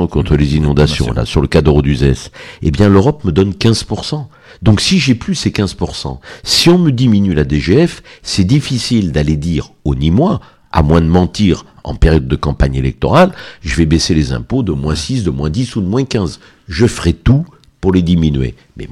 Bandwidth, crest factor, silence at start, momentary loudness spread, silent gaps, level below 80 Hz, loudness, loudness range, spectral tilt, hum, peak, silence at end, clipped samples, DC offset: 14 kHz; 12 dB; 0 s; 10 LU; none; -24 dBFS; -13 LUFS; 3 LU; -6 dB/octave; none; 0 dBFS; 0 s; under 0.1%; under 0.1%